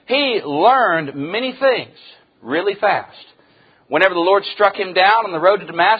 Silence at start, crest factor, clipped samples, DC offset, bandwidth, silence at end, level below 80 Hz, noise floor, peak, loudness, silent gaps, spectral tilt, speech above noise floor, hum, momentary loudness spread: 0.1 s; 18 dB; under 0.1%; under 0.1%; 5 kHz; 0 s; -66 dBFS; -53 dBFS; 0 dBFS; -16 LUFS; none; -6.5 dB/octave; 37 dB; none; 9 LU